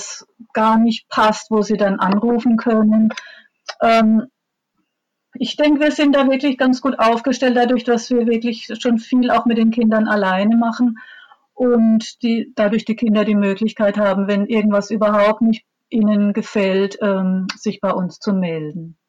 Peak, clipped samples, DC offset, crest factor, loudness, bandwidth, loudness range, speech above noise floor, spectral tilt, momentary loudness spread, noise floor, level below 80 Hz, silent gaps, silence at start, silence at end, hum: -8 dBFS; under 0.1%; under 0.1%; 8 dB; -17 LUFS; 7.8 kHz; 2 LU; 59 dB; -6 dB/octave; 8 LU; -75 dBFS; -58 dBFS; none; 0 s; 0.15 s; none